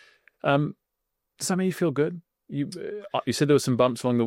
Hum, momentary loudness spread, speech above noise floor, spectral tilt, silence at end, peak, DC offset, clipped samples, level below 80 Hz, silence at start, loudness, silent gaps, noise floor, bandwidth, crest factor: none; 11 LU; 57 dB; -5.5 dB/octave; 0 s; -8 dBFS; under 0.1%; under 0.1%; -68 dBFS; 0.45 s; -26 LUFS; none; -82 dBFS; 16.5 kHz; 18 dB